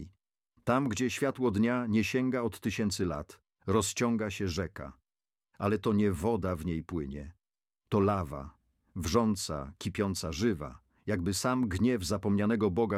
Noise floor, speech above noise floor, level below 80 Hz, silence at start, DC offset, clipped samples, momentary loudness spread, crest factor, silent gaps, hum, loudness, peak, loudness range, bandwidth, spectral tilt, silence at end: under -90 dBFS; over 60 dB; -52 dBFS; 0 s; under 0.1%; under 0.1%; 14 LU; 18 dB; none; none; -31 LUFS; -12 dBFS; 3 LU; 15.5 kHz; -5.5 dB/octave; 0 s